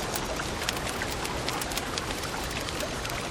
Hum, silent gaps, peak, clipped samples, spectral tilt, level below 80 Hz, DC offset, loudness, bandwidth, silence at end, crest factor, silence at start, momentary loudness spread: none; none; -10 dBFS; under 0.1%; -3 dB/octave; -42 dBFS; under 0.1%; -31 LUFS; 19.5 kHz; 0 s; 22 dB; 0 s; 2 LU